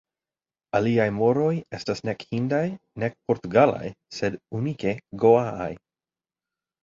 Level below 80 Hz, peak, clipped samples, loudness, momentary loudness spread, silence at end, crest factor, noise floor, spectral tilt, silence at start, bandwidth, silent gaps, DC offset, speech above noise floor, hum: -58 dBFS; -4 dBFS; under 0.1%; -24 LUFS; 11 LU; 1.05 s; 20 dB; under -90 dBFS; -7 dB/octave; 0.75 s; 7.6 kHz; none; under 0.1%; over 66 dB; none